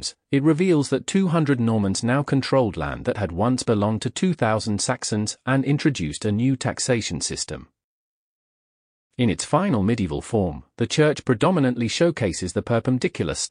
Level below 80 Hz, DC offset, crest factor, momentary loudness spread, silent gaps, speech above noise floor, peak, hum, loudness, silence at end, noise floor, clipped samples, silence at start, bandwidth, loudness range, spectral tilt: -48 dBFS; under 0.1%; 16 dB; 6 LU; 7.84-9.10 s; over 68 dB; -6 dBFS; none; -22 LUFS; 0 s; under -90 dBFS; under 0.1%; 0 s; 10.5 kHz; 4 LU; -5.5 dB/octave